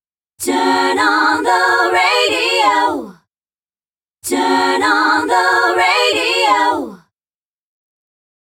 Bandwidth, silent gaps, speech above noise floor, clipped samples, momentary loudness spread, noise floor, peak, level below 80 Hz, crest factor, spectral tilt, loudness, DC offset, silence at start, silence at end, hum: 18 kHz; none; over 77 dB; under 0.1%; 7 LU; under -90 dBFS; -2 dBFS; -60 dBFS; 14 dB; -1.5 dB/octave; -13 LUFS; under 0.1%; 0.4 s; 1.45 s; none